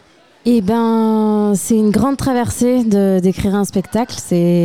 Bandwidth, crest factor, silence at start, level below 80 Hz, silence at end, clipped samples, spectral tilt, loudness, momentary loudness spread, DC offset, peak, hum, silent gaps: 16 kHz; 10 dB; 0.45 s; -40 dBFS; 0 s; under 0.1%; -6.5 dB/octave; -15 LUFS; 5 LU; 0.5%; -4 dBFS; none; none